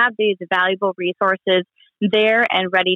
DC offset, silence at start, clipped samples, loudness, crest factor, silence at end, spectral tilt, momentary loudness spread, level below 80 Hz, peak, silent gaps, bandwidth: under 0.1%; 0 s; under 0.1%; -18 LUFS; 14 dB; 0 s; -6.5 dB/octave; 6 LU; -70 dBFS; -4 dBFS; none; 6.4 kHz